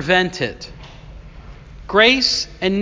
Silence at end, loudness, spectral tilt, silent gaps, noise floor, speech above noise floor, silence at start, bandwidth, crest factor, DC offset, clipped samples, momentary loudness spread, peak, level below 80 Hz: 0 s; -16 LUFS; -3.5 dB/octave; none; -38 dBFS; 21 dB; 0 s; 7.6 kHz; 20 dB; under 0.1%; under 0.1%; 18 LU; 0 dBFS; -40 dBFS